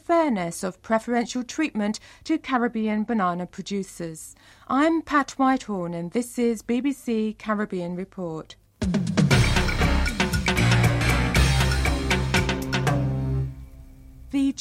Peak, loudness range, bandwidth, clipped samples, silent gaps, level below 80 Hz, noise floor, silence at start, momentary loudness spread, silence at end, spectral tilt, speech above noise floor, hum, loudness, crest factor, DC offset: -6 dBFS; 6 LU; 16 kHz; under 0.1%; none; -32 dBFS; -44 dBFS; 0.1 s; 12 LU; 0 s; -5.5 dB/octave; 19 dB; none; -24 LUFS; 18 dB; under 0.1%